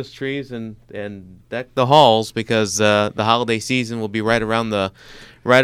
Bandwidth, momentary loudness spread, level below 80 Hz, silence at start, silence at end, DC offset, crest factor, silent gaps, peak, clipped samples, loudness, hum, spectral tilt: 15.5 kHz; 18 LU; -50 dBFS; 0 s; 0 s; under 0.1%; 18 dB; none; 0 dBFS; under 0.1%; -18 LUFS; none; -4.5 dB/octave